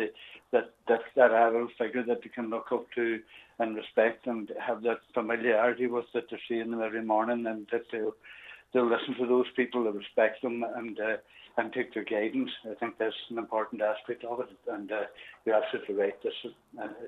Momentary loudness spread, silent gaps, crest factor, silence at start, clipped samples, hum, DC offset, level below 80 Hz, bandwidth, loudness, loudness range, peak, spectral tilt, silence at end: 10 LU; none; 22 dB; 0 s; under 0.1%; none; under 0.1%; -78 dBFS; 4.2 kHz; -31 LUFS; 5 LU; -8 dBFS; -6.5 dB/octave; 0 s